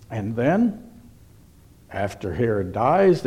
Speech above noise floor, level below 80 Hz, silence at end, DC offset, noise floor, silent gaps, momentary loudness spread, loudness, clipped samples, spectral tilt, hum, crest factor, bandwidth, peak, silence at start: 30 dB; -50 dBFS; 0 s; under 0.1%; -50 dBFS; none; 11 LU; -22 LUFS; under 0.1%; -8 dB/octave; none; 16 dB; 13.5 kHz; -8 dBFS; 0 s